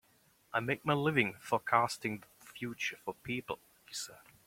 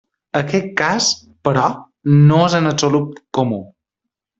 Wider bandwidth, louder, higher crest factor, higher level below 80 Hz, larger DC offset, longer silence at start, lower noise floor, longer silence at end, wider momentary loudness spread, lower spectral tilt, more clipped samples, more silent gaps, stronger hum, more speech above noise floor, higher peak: first, 16.5 kHz vs 8 kHz; second, -35 LUFS vs -16 LUFS; first, 26 dB vs 16 dB; second, -72 dBFS vs -54 dBFS; neither; first, 0.55 s vs 0.35 s; second, -69 dBFS vs -81 dBFS; second, 0.3 s vs 0.75 s; first, 14 LU vs 11 LU; about the same, -4.5 dB/octave vs -5 dB/octave; neither; neither; neither; second, 34 dB vs 66 dB; second, -12 dBFS vs 0 dBFS